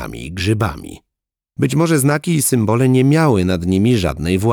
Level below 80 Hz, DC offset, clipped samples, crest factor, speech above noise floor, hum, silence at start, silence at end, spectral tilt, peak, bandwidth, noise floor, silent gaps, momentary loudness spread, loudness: -38 dBFS; under 0.1%; under 0.1%; 14 dB; 66 dB; none; 0 s; 0 s; -6 dB/octave; -2 dBFS; over 20 kHz; -81 dBFS; none; 10 LU; -15 LUFS